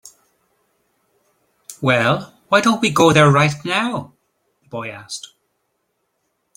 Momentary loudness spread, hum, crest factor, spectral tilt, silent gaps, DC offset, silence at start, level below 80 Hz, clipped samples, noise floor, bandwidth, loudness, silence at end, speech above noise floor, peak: 19 LU; none; 20 dB; -5 dB/octave; none; under 0.1%; 1.7 s; -56 dBFS; under 0.1%; -71 dBFS; 16.5 kHz; -16 LUFS; 1.4 s; 55 dB; 0 dBFS